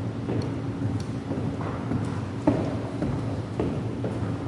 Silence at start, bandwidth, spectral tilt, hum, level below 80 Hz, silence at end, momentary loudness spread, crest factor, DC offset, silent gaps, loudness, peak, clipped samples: 0 s; 11 kHz; -8 dB/octave; none; -48 dBFS; 0 s; 5 LU; 22 dB; under 0.1%; none; -29 LUFS; -6 dBFS; under 0.1%